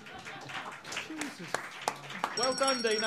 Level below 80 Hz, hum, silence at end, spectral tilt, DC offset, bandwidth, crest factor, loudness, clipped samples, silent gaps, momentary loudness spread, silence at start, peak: -74 dBFS; none; 0 s; -2 dB/octave; under 0.1%; 15.5 kHz; 24 dB; -34 LUFS; under 0.1%; none; 12 LU; 0 s; -10 dBFS